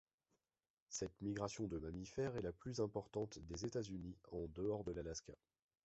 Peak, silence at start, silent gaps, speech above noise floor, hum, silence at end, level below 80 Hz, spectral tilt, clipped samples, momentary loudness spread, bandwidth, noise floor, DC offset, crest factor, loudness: -26 dBFS; 0.9 s; none; over 44 dB; none; 0.5 s; -64 dBFS; -6.5 dB/octave; under 0.1%; 6 LU; 8 kHz; under -90 dBFS; under 0.1%; 20 dB; -47 LUFS